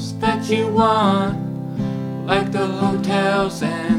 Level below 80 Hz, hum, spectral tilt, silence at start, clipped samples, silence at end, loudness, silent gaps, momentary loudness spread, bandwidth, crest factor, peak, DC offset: -46 dBFS; none; -6 dB/octave; 0 s; under 0.1%; 0 s; -19 LUFS; none; 9 LU; 14 kHz; 18 dB; -2 dBFS; under 0.1%